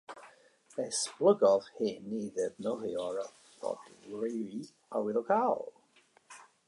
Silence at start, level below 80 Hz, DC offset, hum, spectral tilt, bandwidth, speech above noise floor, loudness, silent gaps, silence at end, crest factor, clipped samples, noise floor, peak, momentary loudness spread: 0.1 s; -80 dBFS; under 0.1%; none; -4 dB/octave; 11.5 kHz; 34 dB; -33 LUFS; none; 0.25 s; 20 dB; under 0.1%; -67 dBFS; -14 dBFS; 18 LU